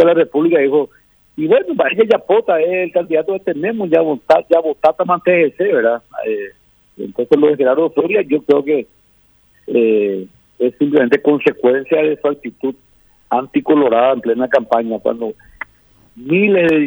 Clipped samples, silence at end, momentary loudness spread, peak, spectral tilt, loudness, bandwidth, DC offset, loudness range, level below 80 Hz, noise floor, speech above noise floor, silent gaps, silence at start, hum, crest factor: under 0.1%; 0 s; 12 LU; 0 dBFS; -8 dB/octave; -15 LUFS; over 20 kHz; under 0.1%; 2 LU; -58 dBFS; -53 dBFS; 39 dB; none; 0 s; none; 14 dB